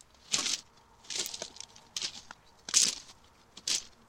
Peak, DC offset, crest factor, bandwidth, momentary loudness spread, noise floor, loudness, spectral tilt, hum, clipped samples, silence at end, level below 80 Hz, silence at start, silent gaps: -4 dBFS; under 0.1%; 32 dB; 17 kHz; 18 LU; -58 dBFS; -31 LUFS; 1.5 dB/octave; none; under 0.1%; 0.2 s; -68 dBFS; 0.3 s; none